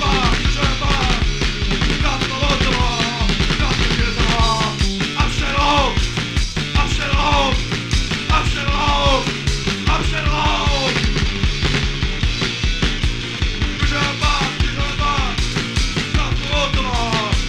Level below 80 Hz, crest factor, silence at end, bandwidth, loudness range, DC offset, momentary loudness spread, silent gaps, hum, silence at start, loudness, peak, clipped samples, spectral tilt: -22 dBFS; 16 dB; 0 s; 11.5 kHz; 2 LU; under 0.1%; 4 LU; none; none; 0 s; -18 LUFS; -2 dBFS; under 0.1%; -4 dB/octave